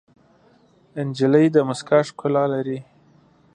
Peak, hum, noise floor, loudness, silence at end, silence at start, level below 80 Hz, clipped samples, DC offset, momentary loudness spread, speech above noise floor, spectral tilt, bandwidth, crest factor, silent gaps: -2 dBFS; none; -56 dBFS; -20 LUFS; 0.7 s; 0.95 s; -68 dBFS; under 0.1%; under 0.1%; 14 LU; 37 dB; -7 dB/octave; 10 kHz; 18 dB; none